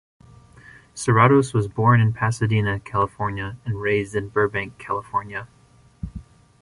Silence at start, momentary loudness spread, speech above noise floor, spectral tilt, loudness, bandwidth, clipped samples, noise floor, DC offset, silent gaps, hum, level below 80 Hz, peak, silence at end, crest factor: 0.95 s; 19 LU; 27 dB; -6.5 dB/octave; -21 LUFS; 11.5 kHz; under 0.1%; -48 dBFS; under 0.1%; none; none; -46 dBFS; -2 dBFS; 0.4 s; 20 dB